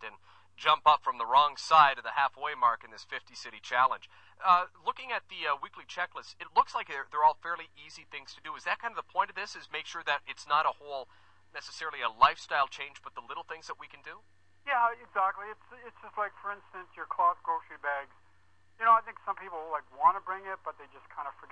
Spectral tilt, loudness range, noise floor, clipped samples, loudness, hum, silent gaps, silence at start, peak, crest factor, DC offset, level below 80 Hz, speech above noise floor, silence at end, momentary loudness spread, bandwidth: -1.5 dB/octave; 7 LU; -68 dBFS; under 0.1%; -30 LUFS; none; none; 0 s; -6 dBFS; 26 dB; under 0.1%; -70 dBFS; 37 dB; 0.05 s; 19 LU; 8.8 kHz